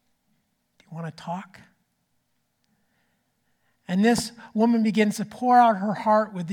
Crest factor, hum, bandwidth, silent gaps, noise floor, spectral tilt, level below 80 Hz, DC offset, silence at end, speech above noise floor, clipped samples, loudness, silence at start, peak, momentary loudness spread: 18 dB; none; 16.5 kHz; none; -73 dBFS; -5.5 dB/octave; -64 dBFS; under 0.1%; 0 s; 50 dB; under 0.1%; -22 LUFS; 0.9 s; -6 dBFS; 18 LU